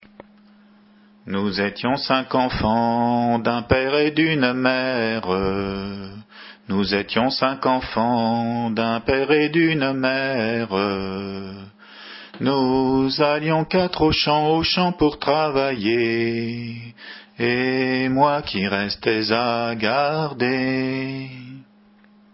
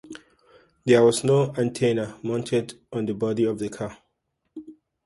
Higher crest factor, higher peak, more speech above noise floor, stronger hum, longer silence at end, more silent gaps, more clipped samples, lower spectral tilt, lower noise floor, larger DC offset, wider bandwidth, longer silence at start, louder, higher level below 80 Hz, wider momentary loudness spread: about the same, 20 dB vs 18 dB; first, -2 dBFS vs -6 dBFS; second, 32 dB vs 53 dB; neither; first, 0.7 s vs 0.35 s; neither; neither; first, -9.5 dB/octave vs -6 dB/octave; second, -53 dBFS vs -76 dBFS; neither; second, 5.8 kHz vs 11.5 kHz; first, 1.25 s vs 0.05 s; about the same, -21 LUFS vs -23 LUFS; first, -46 dBFS vs -62 dBFS; second, 14 LU vs 25 LU